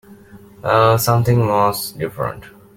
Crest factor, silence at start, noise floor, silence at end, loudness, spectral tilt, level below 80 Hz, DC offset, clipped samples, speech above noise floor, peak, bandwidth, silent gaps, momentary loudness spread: 16 dB; 0.1 s; -42 dBFS; 0.25 s; -17 LUFS; -5.5 dB/octave; -48 dBFS; under 0.1%; under 0.1%; 26 dB; -2 dBFS; 17 kHz; none; 12 LU